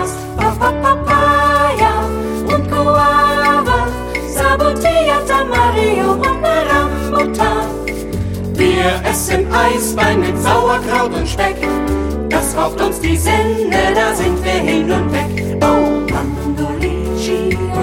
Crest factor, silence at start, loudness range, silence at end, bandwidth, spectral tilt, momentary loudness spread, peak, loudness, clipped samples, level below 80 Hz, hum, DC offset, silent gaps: 14 dB; 0 s; 3 LU; 0 s; 17 kHz; -5 dB/octave; 7 LU; 0 dBFS; -14 LUFS; under 0.1%; -26 dBFS; none; under 0.1%; none